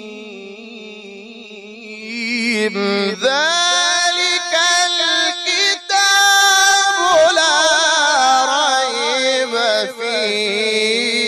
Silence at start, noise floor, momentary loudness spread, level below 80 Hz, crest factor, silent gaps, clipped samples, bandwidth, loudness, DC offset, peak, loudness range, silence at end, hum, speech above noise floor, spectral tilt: 0 s; -35 dBFS; 22 LU; -62 dBFS; 12 dB; none; under 0.1%; 15 kHz; -14 LUFS; under 0.1%; -4 dBFS; 6 LU; 0 s; none; 18 dB; -0.5 dB/octave